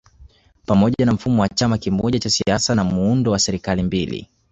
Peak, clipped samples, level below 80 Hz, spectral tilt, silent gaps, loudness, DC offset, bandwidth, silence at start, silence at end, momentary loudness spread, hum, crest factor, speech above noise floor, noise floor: -2 dBFS; under 0.1%; -40 dBFS; -5 dB/octave; none; -19 LUFS; under 0.1%; 8.2 kHz; 0.2 s; 0.25 s; 5 LU; none; 16 dB; 30 dB; -48 dBFS